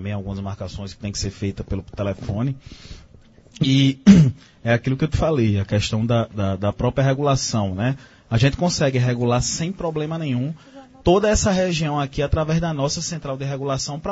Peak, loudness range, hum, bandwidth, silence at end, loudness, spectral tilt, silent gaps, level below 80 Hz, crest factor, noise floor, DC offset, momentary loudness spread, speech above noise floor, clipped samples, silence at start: 0 dBFS; 4 LU; none; 8 kHz; 0 s; -21 LUFS; -5.5 dB/octave; none; -38 dBFS; 20 dB; -49 dBFS; under 0.1%; 12 LU; 28 dB; under 0.1%; 0 s